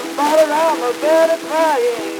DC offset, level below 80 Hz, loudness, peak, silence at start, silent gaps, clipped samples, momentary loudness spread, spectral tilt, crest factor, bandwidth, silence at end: under 0.1%; -78 dBFS; -15 LUFS; -2 dBFS; 0 s; none; under 0.1%; 4 LU; -2.5 dB/octave; 12 dB; 19.5 kHz; 0 s